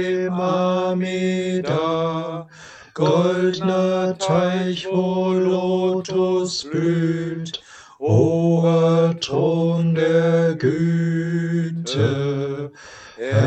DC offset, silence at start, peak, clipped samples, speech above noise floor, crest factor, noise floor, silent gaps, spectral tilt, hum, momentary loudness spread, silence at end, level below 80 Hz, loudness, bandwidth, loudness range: under 0.1%; 0 s; -4 dBFS; under 0.1%; 23 dB; 16 dB; -42 dBFS; none; -7 dB/octave; none; 11 LU; 0 s; -60 dBFS; -20 LUFS; 8.6 kHz; 3 LU